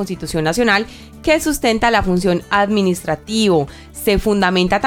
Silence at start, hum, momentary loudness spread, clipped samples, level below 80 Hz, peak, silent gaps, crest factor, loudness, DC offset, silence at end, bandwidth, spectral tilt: 0 s; none; 7 LU; under 0.1%; -34 dBFS; -2 dBFS; none; 16 dB; -16 LUFS; under 0.1%; 0 s; 18 kHz; -4.5 dB/octave